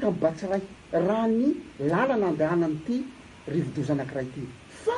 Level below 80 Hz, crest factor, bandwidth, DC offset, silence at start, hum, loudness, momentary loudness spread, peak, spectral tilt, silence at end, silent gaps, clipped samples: -58 dBFS; 16 dB; 11 kHz; under 0.1%; 0 s; none; -27 LUFS; 11 LU; -10 dBFS; -7.5 dB/octave; 0 s; none; under 0.1%